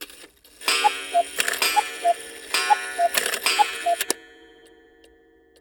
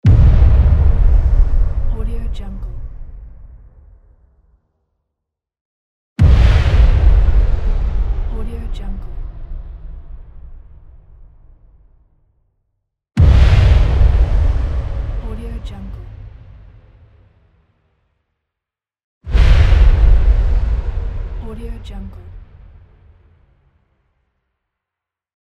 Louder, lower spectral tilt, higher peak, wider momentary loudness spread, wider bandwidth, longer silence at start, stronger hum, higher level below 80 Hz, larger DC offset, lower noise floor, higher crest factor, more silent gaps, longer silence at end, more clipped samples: second, -22 LUFS vs -16 LUFS; second, 1 dB/octave vs -8 dB/octave; about the same, -2 dBFS vs 0 dBFS; second, 7 LU vs 22 LU; first, over 20 kHz vs 6.2 kHz; about the same, 0 s vs 0.05 s; neither; second, -64 dBFS vs -16 dBFS; neither; second, -56 dBFS vs -85 dBFS; first, 22 dB vs 14 dB; second, none vs 5.61-6.16 s, 19.04-19.21 s; second, 1.35 s vs 3.15 s; neither